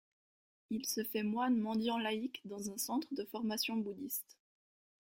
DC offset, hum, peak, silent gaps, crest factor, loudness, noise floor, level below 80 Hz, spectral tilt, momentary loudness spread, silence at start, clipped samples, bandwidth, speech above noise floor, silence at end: under 0.1%; none; -24 dBFS; none; 16 dB; -38 LUFS; under -90 dBFS; -80 dBFS; -3.5 dB/octave; 9 LU; 0.7 s; under 0.1%; 16.5 kHz; over 52 dB; 0.8 s